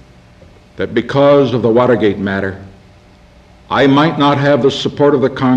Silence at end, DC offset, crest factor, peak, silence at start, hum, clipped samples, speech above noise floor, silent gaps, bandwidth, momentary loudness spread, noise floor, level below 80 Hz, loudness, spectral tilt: 0 s; under 0.1%; 12 dB; 0 dBFS; 0.8 s; none; under 0.1%; 31 dB; none; 8.6 kHz; 9 LU; -43 dBFS; -46 dBFS; -12 LUFS; -7 dB/octave